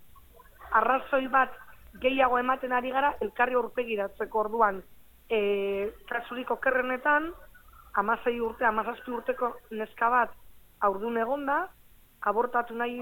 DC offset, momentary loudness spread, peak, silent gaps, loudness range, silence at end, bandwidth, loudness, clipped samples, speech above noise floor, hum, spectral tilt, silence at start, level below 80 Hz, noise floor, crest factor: under 0.1%; 8 LU; -10 dBFS; none; 3 LU; 0 s; 17.5 kHz; -28 LUFS; under 0.1%; 25 dB; none; -5.5 dB/octave; 0 s; -58 dBFS; -53 dBFS; 20 dB